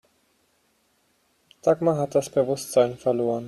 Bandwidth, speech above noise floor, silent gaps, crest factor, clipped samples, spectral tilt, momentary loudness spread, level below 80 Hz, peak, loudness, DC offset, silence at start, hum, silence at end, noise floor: 14 kHz; 45 dB; none; 18 dB; under 0.1%; -6 dB/octave; 3 LU; -64 dBFS; -6 dBFS; -23 LUFS; under 0.1%; 1.65 s; none; 0 s; -67 dBFS